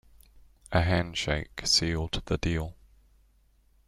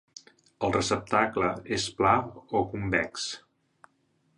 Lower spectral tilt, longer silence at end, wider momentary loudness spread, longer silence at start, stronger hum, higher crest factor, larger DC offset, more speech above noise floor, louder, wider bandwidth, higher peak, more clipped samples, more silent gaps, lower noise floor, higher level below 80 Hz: about the same, -4 dB/octave vs -4 dB/octave; first, 1.15 s vs 1 s; about the same, 8 LU vs 8 LU; about the same, 0.7 s vs 0.6 s; neither; about the same, 20 dB vs 22 dB; neither; second, 36 dB vs 43 dB; about the same, -28 LUFS vs -28 LUFS; first, 13 kHz vs 11.5 kHz; about the same, -10 dBFS vs -8 dBFS; neither; neither; second, -64 dBFS vs -70 dBFS; first, -44 dBFS vs -54 dBFS